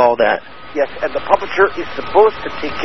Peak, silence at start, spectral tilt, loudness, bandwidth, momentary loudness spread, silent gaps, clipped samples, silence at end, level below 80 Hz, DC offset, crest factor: 0 dBFS; 0 s; -5.5 dB/octave; -16 LUFS; 6.2 kHz; 11 LU; none; under 0.1%; 0 s; -44 dBFS; 3%; 16 dB